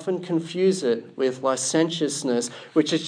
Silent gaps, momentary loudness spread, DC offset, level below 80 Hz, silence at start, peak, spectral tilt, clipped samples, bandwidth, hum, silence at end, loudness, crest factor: none; 5 LU; under 0.1%; -82 dBFS; 0 s; -8 dBFS; -4 dB/octave; under 0.1%; 10.5 kHz; none; 0 s; -24 LUFS; 16 dB